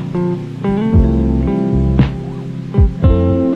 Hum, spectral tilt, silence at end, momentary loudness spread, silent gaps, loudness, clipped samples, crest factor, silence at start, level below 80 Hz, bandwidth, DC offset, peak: none; -10 dB/octave; 0 s; 7 LU; none; -15 LUFS; under 0.1%; 14 dB; 0 s; -20 dBFS; 6.2 kHz; under 0.1%; 0 dBFS